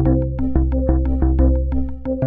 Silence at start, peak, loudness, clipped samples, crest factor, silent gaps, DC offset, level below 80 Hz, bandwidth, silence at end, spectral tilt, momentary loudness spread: 0 s; -2 dBFS; -19 LUFS; under 0.1%; 14 dB; none; under 0.1%; -18 dBFS; 2.4 kHz; 0 s; -13.5 dB/octave; 7 LU